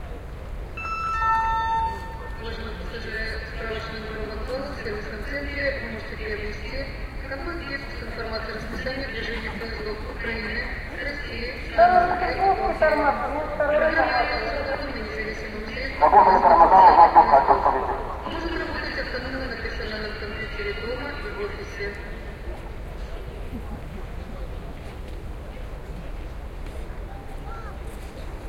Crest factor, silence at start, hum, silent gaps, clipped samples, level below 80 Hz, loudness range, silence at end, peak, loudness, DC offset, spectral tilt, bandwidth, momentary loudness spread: 22 dB; 0 s; none; none; under 0.1%; -36 dBFS; 20 LU; 0 s; -2 dBFS; -23 LUFS; under 0.1%; -6 dB/octave; 15.5 kHz; 20 LU